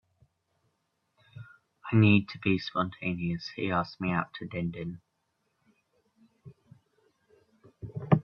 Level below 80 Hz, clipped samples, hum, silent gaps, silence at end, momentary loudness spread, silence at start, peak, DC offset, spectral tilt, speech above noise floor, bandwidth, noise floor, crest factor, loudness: -64 dBFS; under 0.1%; none; none; 0 s; 24 LU; 1.35 s; -8 dBFS; under 0.1%; -8.5 dB/octave; 49 dB; 6.6 kHz; -78 dBFS; 24 dB; -29 LUFS